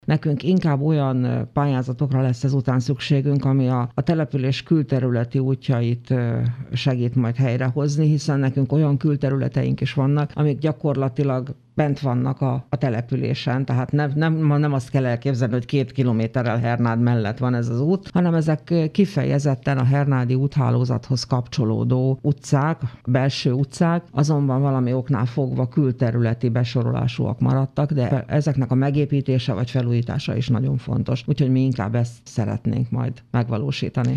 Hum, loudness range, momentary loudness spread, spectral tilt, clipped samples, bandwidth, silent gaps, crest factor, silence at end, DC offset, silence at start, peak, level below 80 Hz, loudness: none; 2 LU; 4 LU; -8 dB/octave; under 0.1%; 9.2 kHz; none; 16 dB; 0 s; under 0.1%; 0.1 s; -4 dBFS; -52 dBFS; -21 LUFS